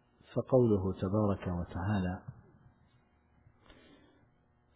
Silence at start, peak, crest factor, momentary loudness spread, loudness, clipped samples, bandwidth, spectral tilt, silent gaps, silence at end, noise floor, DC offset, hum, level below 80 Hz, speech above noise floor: 0.3 s; -14 dBFS; 20 dB; 12 LU; -33 LUFS; under 0.1%; 4 kHz; -9 dB/octave; none; 2.45 s; -69 dBFS; under 0.1%; none; -52 dBFS; 38 dB